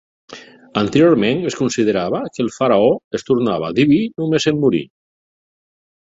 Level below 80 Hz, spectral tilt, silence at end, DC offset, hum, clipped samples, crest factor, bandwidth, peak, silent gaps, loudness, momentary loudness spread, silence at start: -54 dBFS; -6 dB/octave; 1.25 s; under 0.1%; none; under 0.1%; 16 dB; 8 kHz; -2 dBFS; 3.04-3.11 s; -17 LUFS; 8 LU; 0.3 s